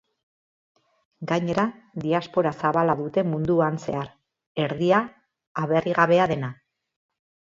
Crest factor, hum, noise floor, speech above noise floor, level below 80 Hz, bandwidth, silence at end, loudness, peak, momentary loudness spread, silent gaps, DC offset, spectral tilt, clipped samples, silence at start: 20 dB; none; under -90 dBFS; over 67 dB; -60 dBFS; 7.6 kHz; 1.05 s; -24 LUFS; -6 dBFS; 14 LU; 4.47-4.55 s, 5.47-5.55 s; under 0.1%; -7 dB/octave; under 0.1%; 1.2 s